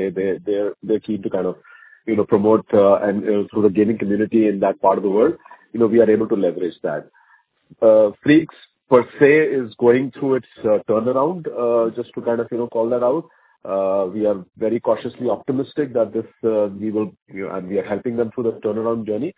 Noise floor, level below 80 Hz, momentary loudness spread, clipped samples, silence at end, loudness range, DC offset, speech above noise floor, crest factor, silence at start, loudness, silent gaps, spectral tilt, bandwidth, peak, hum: -57 dBFS; -58 dBFS; 10 LU; under 0.1%; 0.05 s; 6 LU; under 0.1%; 38 dB; 18 dB; 0 s; -19 LUFS; 17.22-17.26 s; -11 dB/octave; 4 kHz; 0 dBFS; none